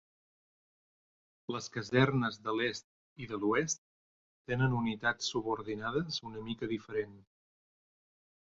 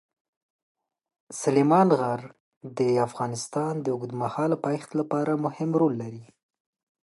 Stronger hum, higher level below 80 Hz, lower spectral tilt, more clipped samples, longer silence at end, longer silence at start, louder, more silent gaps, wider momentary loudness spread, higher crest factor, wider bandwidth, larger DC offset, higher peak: neither; first, -64 dBFS vs -74 dBFS; second, -4.5 dB/octave vs -6.5 dB/octave; neither; first, 1.25 s vs 0.8 s; first, 1.5 s vs 1.3 s; second, -34 LUFS vs -26 LUFS; first, 2.84-3.16 s, 3.78-4.45 s vs 2.40-2.61 s; about the same, 12 LU vs 14 LU; first, 24 dB vs 18 dB; second, 7.6 kHz vs 11.5 kHz; neither; second, -14 dBFS vs -8 dBFS